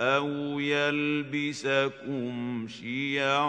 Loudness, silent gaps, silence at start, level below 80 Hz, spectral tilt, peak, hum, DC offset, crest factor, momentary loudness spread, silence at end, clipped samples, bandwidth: -29 LUFS; none; 0 s; -76 dBFS; -5 dB/octave; -10 dBFS; none; under 0.1%; 18 dB; 8 LU; 0 s; under 0.1%; 9.8 kHz